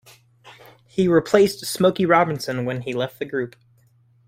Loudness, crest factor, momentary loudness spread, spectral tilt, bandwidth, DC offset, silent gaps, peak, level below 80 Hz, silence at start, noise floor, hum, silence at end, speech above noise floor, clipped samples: -21 LUFS; 18 dB; 11 LU; -5.5 dB/octave; 16 kHz; under 0.1%; none; -2 dBFS; -60 dBFS; 0.45 s; -58 dBFS; none; 0.8 s; 38 dB; under 0.1%